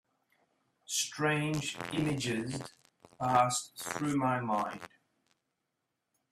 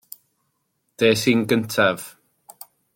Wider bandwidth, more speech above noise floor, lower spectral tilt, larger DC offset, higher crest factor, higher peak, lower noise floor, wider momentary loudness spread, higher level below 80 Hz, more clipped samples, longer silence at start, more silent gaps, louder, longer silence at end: about the same, 15.5 kHz vs 17 kHz; about the same, 52 dB vs 53 dB; about the same, -4 dB/octave vs -4.5 dB/octave; neither; about the same, 20 dB vs 20 dB; second, -14 dBFS vs -4 dBFS; first, -84 dBFS vs -72 dBFS; about the same, 12 LU vs 11 LU; second, -68 dBFS vs -62 dBFS; neither; about the same, 0.9 s vs 1 s; neither; second, -33 LUFS vs -20 LUFS; first, 1.45 s vs 0.85 s